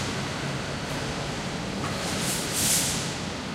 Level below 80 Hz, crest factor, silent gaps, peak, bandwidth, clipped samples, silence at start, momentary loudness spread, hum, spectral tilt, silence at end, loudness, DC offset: -46 dBFS; 18 dB; none; -10 dBFS; 16 kHz; under 0.1%; 0 s; 9 LU; none; -3 dB/octave; 0 s; -27 LUFS; under 0.1%